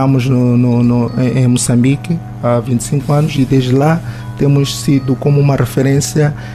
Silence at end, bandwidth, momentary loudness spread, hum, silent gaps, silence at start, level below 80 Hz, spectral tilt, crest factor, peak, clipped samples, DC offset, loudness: 0 s; 14 kHz; 4 LU; 50 Hz at -35 dBFS; none; 0 s; -38 dBFS; -6.5 dB/octave; 10 dB; -2 dBFS; under 0.1%; under 0.1%; -13 LUFS